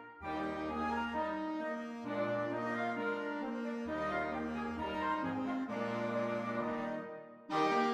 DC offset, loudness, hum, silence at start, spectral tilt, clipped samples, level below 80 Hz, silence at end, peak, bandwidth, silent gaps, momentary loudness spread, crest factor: under 0.1%; -37 LUFS; none; 0 s; -6 dB/octave; under 0.1%; -64 dBFS; 0 s; -20 dBFS; 11.5 kHz; none; 4 LU; 18 dB